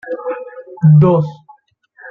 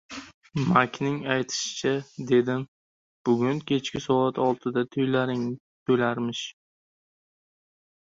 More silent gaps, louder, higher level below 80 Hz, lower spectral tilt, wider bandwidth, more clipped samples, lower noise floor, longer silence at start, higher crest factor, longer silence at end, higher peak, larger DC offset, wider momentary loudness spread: second, none vs 0.34-0.41 s, 2.68-3.25 s, 5.60-5.86 s; first, -13 LUFS vs -26 LUFS; first, -50 dBFS vs -64 dBFS; first, -12 dB/octave vs -5.5 dB/octave; second, 3.4 kHz vs 7.8 kHz; neither; second, -49 dBFS vs under -90 dBFS; about the same, 0.05 s vs 0.1 s; second, 14 dB vs 22 dB; second, 0 s vs 1.6 s; about the same, -2 dBFS vs -4 dBFS; neither; first, 18 LU vs 11 LU